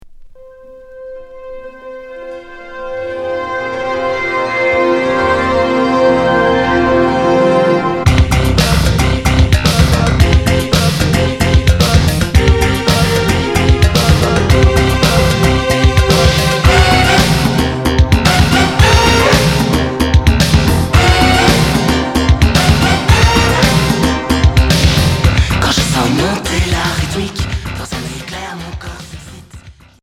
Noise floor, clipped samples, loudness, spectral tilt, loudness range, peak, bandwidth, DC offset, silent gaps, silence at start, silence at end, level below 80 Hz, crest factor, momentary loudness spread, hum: -36 dBFS; 0.2%; -11 LUFS; -5 dB/octave; 8 LU; 0 dBFS; 16.5 kHz; under 0.1%; none; 0.05 s; 0.3 s; -18 dBFS; 12 dB; 15 LU; none